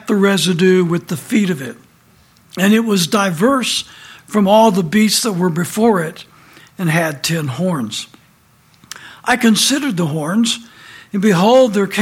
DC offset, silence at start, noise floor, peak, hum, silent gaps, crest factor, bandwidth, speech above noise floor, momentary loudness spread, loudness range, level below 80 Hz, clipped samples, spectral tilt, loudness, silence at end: under 0.1%; 0.05 s; -51 dBFS; 0 dBFS; none; none; 14 dB; 16.5 kHz; 37 dB; 13 LU; 5 LU; -58 dBFS; under 0.1%; -4.5 dB/octave; -15 LUFS; 0 s